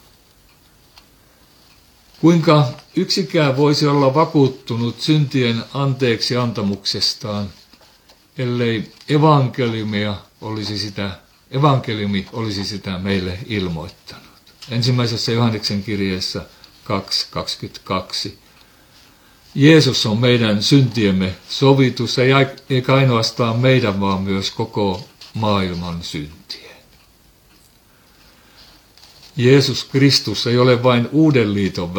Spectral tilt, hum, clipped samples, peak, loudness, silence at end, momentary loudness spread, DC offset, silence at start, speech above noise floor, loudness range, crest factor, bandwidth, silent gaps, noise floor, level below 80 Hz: -6 dB/octave; none; under 0.1%; 0 dBFS; -17 LUFS; 0 s; 13 LU; under 0.1%; 2.2 s; 35 dB; 8 LU; 18 dB; 19 kHz; none; -52 dBFS; -52 dBFS